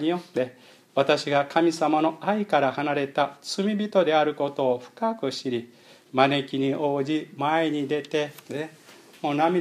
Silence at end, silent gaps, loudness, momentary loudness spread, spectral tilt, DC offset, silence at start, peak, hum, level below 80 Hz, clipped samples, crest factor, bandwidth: 0 s; none; -25 LUFS; 9 LU; -5.5 dB/octave; under 0.1%; 0 s; -4 dBFS; none; -78 dBFS; under 0.1%; 22 dB; 14.5 kHz